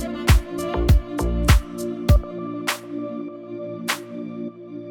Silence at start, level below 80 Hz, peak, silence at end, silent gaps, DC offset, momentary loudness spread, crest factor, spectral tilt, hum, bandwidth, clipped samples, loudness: 0 s; -24 dBFS; -2 dBFS; 0 s; none; under 0.1%; 14 LU; 20 dB; -5.5 dB/octave; none; 19 kHz; under 0.1%; -23 LUFS